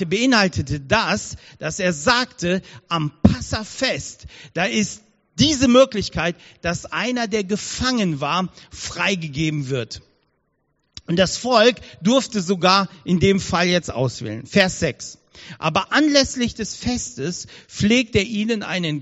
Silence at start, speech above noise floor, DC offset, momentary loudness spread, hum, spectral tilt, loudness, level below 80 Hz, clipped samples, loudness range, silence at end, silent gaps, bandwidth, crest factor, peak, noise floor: 0 s; 48 dB; under 0.1%; 14 LU; none; -3.5 dB/octave; -20 LUFS; -44 dBFS; under 0.1%; 4 LU; 0 s; none; 8 kHz; 20 dB; 0 dBFS; -69 dBFS